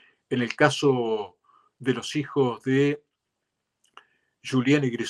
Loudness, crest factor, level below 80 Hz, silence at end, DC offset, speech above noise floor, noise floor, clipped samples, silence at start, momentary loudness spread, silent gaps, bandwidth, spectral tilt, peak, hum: -25 LUFS; 24 dB; -72 dBFS; 0 s; under 0.1%; 58 dB; -81 dBFS; under 0.1%; 0.3 s; 10 LU; none; 12 kHz; -5.5 dB/octave; -4 dBFS; none